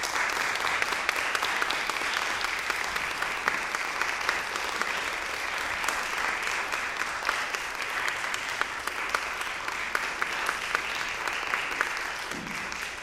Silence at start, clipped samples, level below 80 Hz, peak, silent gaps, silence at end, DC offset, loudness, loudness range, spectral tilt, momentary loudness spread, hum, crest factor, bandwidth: 0 s; under 0.1%; -56 dBFS; -6 dBFS; none; 0 s; under 0.1%; -29 LUFS; 2 LU; -0.5 dB/octave; 4 LU; none; 24 dB; 16 kHz